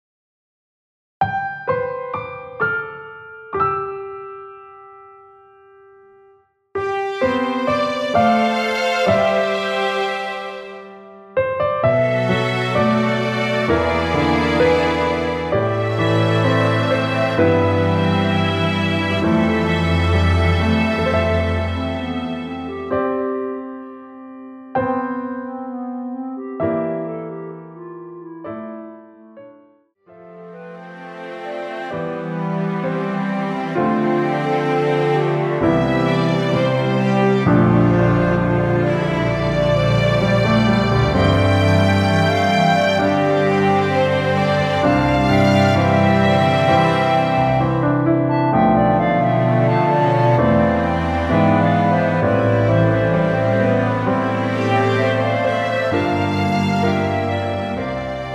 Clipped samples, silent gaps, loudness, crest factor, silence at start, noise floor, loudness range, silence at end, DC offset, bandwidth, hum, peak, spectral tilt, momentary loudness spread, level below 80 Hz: under 0.1%; none; -18 LUFS; 14 dB; 1.2 s; -54 dBFS; 11 LU; 0 s; under 0.1%; 12.5 kHz; none; -2 dBFS; -7 dB/octave; 14 LU; -38 dBFS